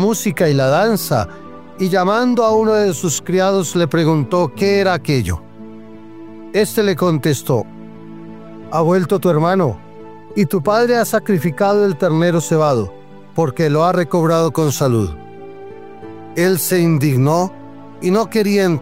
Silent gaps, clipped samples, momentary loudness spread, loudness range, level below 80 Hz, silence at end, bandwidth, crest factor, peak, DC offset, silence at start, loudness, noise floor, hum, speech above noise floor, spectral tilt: none; under 0.1%; 21 LU; 3 LU; -46 dBFS; 0 s; 16.5 kHz; 14 dB; -2 dBFS; 0.9%; 0 s; -16 LUFS; -36 dBFS; none; 22 dB; -6 dB/octave